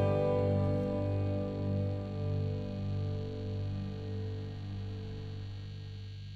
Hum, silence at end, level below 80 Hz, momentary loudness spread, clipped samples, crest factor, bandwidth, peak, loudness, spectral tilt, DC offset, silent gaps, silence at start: 50 Hz at -50 dBFS; 0 s; -52 dBFS; 13 LU; under 0.1%; 16 dB; 6 kHz; -18 dBFS; -36 LUFS; -9.5 dB/octave; under 0.1%; none; 0 s